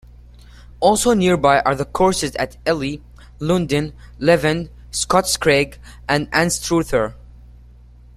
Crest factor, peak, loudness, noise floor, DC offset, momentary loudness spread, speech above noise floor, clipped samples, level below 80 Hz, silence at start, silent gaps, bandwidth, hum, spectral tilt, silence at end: 18 dB; -2 dBFS; -18 LUFS; -44 dBFS; under 0.1%; 11 LU; 26 dB; under 0.1%; -40 dBFS; 0.8 s; none; 15 kHz; 60 Hz at -40 dBFS; -4.5 dB/octave; 0.95 s